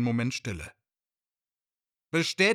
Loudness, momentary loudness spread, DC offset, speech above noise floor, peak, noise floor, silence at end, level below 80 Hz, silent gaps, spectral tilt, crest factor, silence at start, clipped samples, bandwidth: -29 LUFS; 14 LU; under 0.1%; over 63 dB; -12 dBFS; under -90 dBFS; 0 s; -58 dBFS; none; -4.5 dB/octave; 20 dB; 0 s; under 0.1%; 15.5 kHz